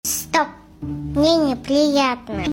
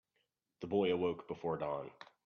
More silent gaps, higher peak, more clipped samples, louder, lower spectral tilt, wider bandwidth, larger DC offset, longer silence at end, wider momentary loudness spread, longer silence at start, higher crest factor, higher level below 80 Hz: neither; first, -4 dBFS vs -22 dBFS; neither; first, -19 LUFS vs -37 LUFS; about the same, -4 dB/octave vs -5 dB/octave; first, 16.5 kHz vs 6.6 kHz; neither; second, 0 s vs 0.25 s; about the same, 13 LU vs 13 LU; second, 0.05 s vs 0.6 s; about the same, 16 dB vs 18 dB; first, -42 dBFS vs -74 dBFS